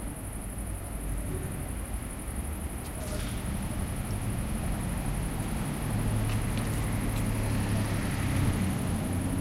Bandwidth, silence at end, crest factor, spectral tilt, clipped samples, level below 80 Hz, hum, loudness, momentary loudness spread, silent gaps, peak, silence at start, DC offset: 16 kHz; 0 s; 14 dB; -5.5 dB/octave; under 0.1%; -36 dBFS; none; -32 LUFS; 7 LU; none; -16 dBFS; 0 s; under 0.1%